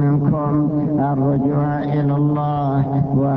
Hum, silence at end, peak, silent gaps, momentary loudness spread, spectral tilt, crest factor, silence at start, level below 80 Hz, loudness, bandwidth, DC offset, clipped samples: none; 0 s; -6 dBFS; none; 2 LU; -12 dB/octave; 12 dB; 0 s; -44 dBFS; -18 LUFS; 4 kHz; under 0.1%; under 0.1%